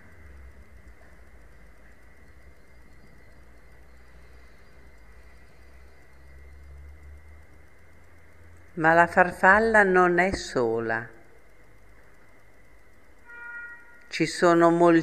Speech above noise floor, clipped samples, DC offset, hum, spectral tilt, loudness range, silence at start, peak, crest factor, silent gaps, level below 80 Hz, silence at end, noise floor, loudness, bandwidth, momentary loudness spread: 36 dB; under 0.1%; 0.3%; none; -5.5 dB/octave; 15 LU; 6.7 s; -2 dBFS; 24 dB; none; -52 dBFS; 0 s; -57 dBFS; -21 LUFS; 13 kHz; 23 LU